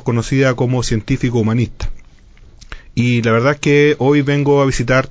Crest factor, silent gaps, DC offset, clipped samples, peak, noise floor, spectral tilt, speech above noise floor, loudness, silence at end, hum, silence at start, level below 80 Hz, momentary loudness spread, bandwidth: 14 dB; none; under 0.1%; under 0.1%; 0 dBFS; -42 dBFS; -6.5 dB/octave; 28 dB; -15 LUFS; 0 s; none; 0.05 s; -34 dBFS; 7 LU; 8 kHz